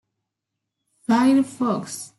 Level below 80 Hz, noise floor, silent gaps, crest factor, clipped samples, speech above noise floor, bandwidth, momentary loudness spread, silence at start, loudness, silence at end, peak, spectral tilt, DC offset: -70 dBFS; -82 dBFS; none; 16 dB; under 0.1%; 62 dB; 12 kHz; 10 LU; 1.1 s; -21 LUFS; 0.1 s; -6 dBFS; -5 dB/octave; under 0.1%